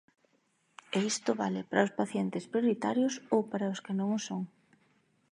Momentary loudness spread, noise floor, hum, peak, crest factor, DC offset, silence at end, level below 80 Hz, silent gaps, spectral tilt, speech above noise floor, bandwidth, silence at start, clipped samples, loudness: 5 LU; -73 dBFS; none; -10 dBFS; 22 dB; under 0.1%; 0.85 s; -82 dBFS; none; -5 dB/octave; 42 dB; 11 kHz; 0.9 s; under 0.1%; -32 LUFS